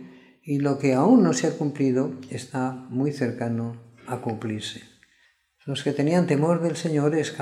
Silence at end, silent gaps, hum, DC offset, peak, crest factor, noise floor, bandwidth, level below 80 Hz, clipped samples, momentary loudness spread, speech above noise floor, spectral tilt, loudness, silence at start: 0 s; none; none; under 0.1%; -6 dBFS; 18 dB; -64 dBFS; 12 kHz; -70 dBFS; under 0.1%; 16 LU; 40 dB; -6.5 dB/octave; -24 LUFS; 0 s